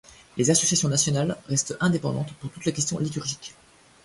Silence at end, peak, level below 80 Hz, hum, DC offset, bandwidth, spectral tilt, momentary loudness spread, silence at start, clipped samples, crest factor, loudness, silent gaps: 0.55 s; -8 dBFS; -58 dBFS; none; under 0.1%; 11.5 kHz; -4 dB/octave; 13 LU; 0.35 s; under 0.1%; 18 dB; -24 LUFS; none